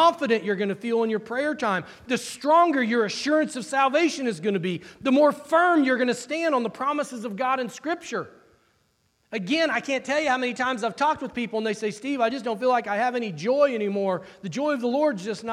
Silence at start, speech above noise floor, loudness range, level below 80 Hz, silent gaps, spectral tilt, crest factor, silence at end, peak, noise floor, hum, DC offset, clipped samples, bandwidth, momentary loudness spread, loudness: 0 s; 44 dB; 5 LU; -70 dBFS; none; -4.5 dB/octave; 16 dB; 0 s; -8 dBFS; -68 dBFS; none; under 0.1%; under 0.1%; 13.5 kHz; 9 LU; -24 LUFS